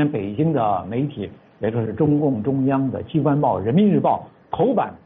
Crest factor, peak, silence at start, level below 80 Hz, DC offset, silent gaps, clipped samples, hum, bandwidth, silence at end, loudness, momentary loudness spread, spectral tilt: 14 dB; -6 dBFS; 0 s; -54 dBFS; under 0.1%; none; under 0.1%; none; 3.9 kHz; 0.1 s; -20 LUFS; 9 LU; -8.5 dB/octave